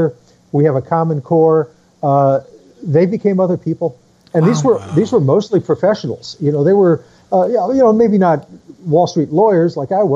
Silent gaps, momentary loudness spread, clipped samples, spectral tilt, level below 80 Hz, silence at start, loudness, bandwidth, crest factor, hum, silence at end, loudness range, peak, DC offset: none; 8 LU; under 0.1%; -8 dB/octave; -56 dBFS; 0 s; -14 LUFS; 7.8 kHz; 12 dB; none; 0 s; 2 LU; -2 dBFS; under 0.1%